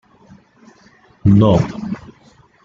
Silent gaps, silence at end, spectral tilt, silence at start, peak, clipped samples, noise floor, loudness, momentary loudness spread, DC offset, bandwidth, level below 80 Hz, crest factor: none; 0.65 s; -9 dB/octave; 1.25 s; -2 dBFS; under 0.1%; -50 dBFS; -15 LUFS; 16 LU; under 0.1%; 7.4 kHz; -42 dBFS; 16 dB